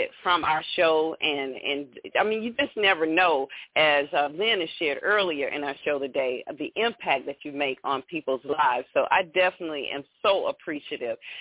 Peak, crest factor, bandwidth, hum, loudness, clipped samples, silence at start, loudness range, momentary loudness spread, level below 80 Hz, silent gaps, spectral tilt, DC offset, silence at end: -8 dBFS; 16 dB; 4 kHz; none; -25 LUFS; under 0.1%; 0 s; 4 LU; 11 LU; -66 dBFS; none; -7 dB/octave; under 0.1%; 0 s